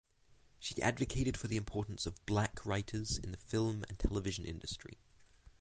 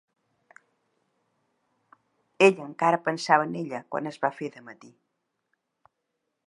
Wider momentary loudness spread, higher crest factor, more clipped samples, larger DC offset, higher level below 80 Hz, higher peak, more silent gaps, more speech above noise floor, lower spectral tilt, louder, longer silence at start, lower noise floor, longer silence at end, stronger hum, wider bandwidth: second, 8 LU vs 15 LU; second, 20 dB vs 26 dB; neither; neither; first, -50 dBFS vs -84 dBFS; second, -20 dBFS vs -4 dBFS; neither; second, 29 dB vs 55 dB; about the same, -5 dB/octave vs -5 dB/octave; second, -39 LUFS vs -25 LUFS; second, 0.3 s vs 2.4 s; second, -67 dBFS vs -80 dBFS; second, 0.1 s vs 1.75 s; neither; second, 9.6 kHz vs 11 kHz